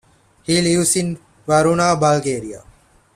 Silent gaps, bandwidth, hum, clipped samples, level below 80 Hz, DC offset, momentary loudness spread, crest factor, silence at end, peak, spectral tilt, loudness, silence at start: none; 15 kHz; none; under 0.1%; -50 dBFS; under 0.1%; 15 LU; 16 dB; 0.55 s; -2 dBFS; -4.5 dB/octave; -17 LUFS; 0.5 s